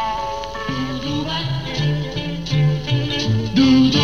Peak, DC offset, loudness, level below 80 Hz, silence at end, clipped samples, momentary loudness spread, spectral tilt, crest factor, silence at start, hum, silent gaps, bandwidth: -4 dBFS; 1%; -20 LUFS; -40 dBFS; 0 s; under 0.1%; 11 LU; -6 dB/octave; 14 dB; 0 s; none; none; 7 kHz